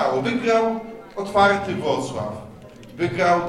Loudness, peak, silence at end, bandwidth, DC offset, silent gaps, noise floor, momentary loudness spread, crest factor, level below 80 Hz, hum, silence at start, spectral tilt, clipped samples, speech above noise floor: -22 LUFS; -2 dBFS; 0 s; 12.5 kHz; under 0.1%; none; -41 dBFS; 17 LU; 20 dB; -52 dBFS; none; 0 s; -5.5 dB/octave; under 0.1%; 21 dB